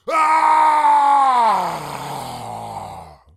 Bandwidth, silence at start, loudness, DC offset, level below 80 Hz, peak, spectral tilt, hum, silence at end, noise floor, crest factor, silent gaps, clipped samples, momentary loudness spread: 15 kHz; 0.05 s; -14 LUFS; under 0.1%; -56 dBFS; -4 dBFS; -3.5 dB/octave; none; 0.25 s; -37 dBFS; 14 dB; none; under 0.1%; 17 LU